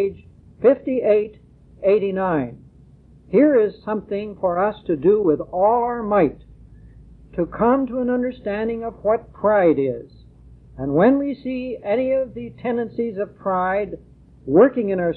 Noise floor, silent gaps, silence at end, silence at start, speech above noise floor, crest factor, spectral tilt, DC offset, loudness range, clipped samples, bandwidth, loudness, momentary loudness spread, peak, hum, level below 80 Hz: -48 dBFS; none; 0 s; 0 s; 29 dB; 18 dB; -11 dB/octave; under 0.1%; 3 LU; under 0.1%; 4.4 kHz; -20 LUFS; 11 LU; -4 dBFS; none; -48 dBFS